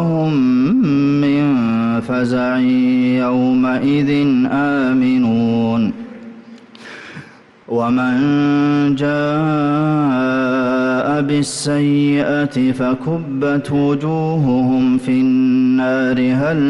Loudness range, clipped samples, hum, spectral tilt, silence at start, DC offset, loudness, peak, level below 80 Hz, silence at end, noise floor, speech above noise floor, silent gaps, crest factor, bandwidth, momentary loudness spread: 4 LU; under 0.1%; none; -7 dB/octave; 0 s; under 0.1%; -15 LUFS; -8 dBFS; -52 dBFS; 0 s; -40 dBFS; 26 dB; none; 8 dB; 11.5 kHz; 5 LU